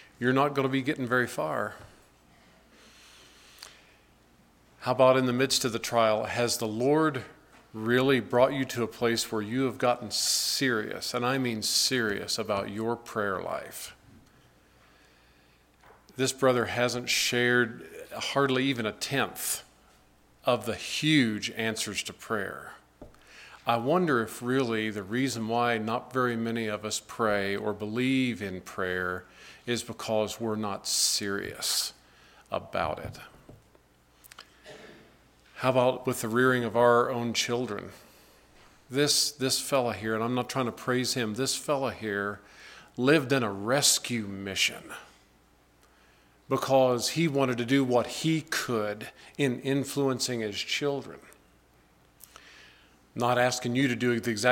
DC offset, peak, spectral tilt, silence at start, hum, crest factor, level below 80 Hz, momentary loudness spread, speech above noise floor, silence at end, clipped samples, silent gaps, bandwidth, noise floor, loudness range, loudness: under 0.1%; -8 dBFS; -3.5 dB/octave; 0.2 s; none; 22 dB; -64 dBFS; 13 LU; 34 dB; 0 s; under 0.1%; none; 17 kHz; -62 dBFS; 7 LU; -28 LUFS